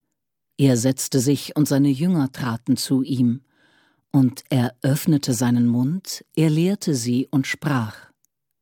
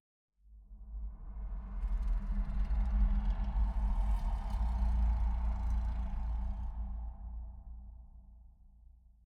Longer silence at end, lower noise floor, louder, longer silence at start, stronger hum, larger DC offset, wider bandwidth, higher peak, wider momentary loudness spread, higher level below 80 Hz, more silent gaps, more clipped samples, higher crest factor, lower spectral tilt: second, 0.65 s vs 0.85 s; first, -80 dBFS vs -59 dBFS; first, -21 LUFS vs -38 LUFS; about the same, 0.6 s vs 0.5 s; neither; neither; first, 19 kHz vs 4.3 kHz; first, -6 dBFS vs -20 dBFS; second, 6 LU vs 18 LU; second, -62 dBFS vs -34 dBFS; neither; neither; about the same, 16 dB vs 14 dB; second, -6 dB/octave vs -8.5 dB/octave